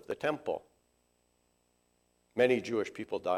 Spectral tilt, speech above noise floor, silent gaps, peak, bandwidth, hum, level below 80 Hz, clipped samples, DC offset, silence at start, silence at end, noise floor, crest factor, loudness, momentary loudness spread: -5.5 dB/octave; 42 dB; none; -14 dBFS; 13.5 kHz; 60 Hz at -75 dBFS; -74 dBFS; under 0.1%; under 0.1%; 0.1 s; 0 s; -74 dBFS; 20 dB; -33 LUFS; 11 LU